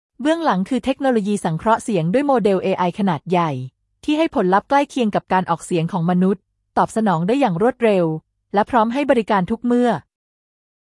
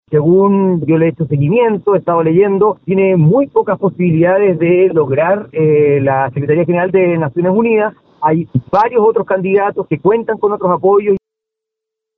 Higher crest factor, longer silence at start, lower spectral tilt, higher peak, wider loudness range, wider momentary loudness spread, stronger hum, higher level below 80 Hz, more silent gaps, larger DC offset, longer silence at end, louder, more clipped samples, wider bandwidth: about the same, 16 dB vs 12 dB; about the same, 0.2 s vs 0.1 s; second, -6.5 dB/octave vs -11.5 dB/octave; second, -4 dBFS vs 0 dBFS; about the same, 1 LU vs 2 LU; about the same, 6 LU vs 5 LU; neither; about the same, -54 dBFS vs -52 dBFS; neither; neither; second, 0.85 s vs 1 s; second, -19 LUFS vs -12 LUFS; neither; first, 12 kHz vs 4.4 kHz